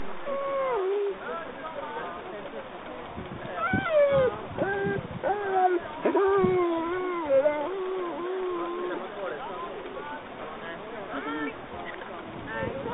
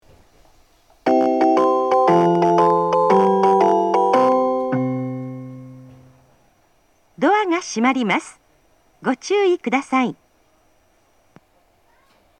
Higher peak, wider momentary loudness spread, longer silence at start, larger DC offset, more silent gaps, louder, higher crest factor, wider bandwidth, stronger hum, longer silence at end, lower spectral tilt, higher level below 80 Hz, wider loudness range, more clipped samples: second, -12 dBFS vs -2 dBFS; first, 15 LU vs 11 LU; second, 0 s vs 1.05 s; neither; neither; second, -29 LUFS vs -18 LUFS; about the same, 18 dB vs 18 dB; second, 4 kHz vs 9.8 kHz; neither; second, 0 s vs 2.25 s; second, -4.5 dB/octave vs -6 dB/octave; first, -56 dBFS vs -64 dBFS; about the same, 10 LU vs 8 LU; neither